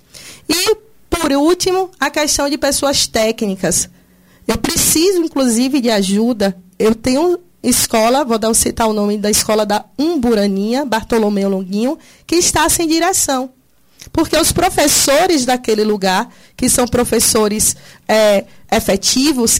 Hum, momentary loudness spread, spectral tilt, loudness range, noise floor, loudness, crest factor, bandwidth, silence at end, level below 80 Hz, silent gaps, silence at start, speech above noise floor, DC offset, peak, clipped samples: none; 7 LU; -3 dB/octave; 2 LU; -48 dBFS; -14 LUFS; 14 dB; 16.5 kHz; 0 s; -38 dBFS; none; 0.15 s; 33 dB; under 0.1%; -2 dBFS; under 0.1%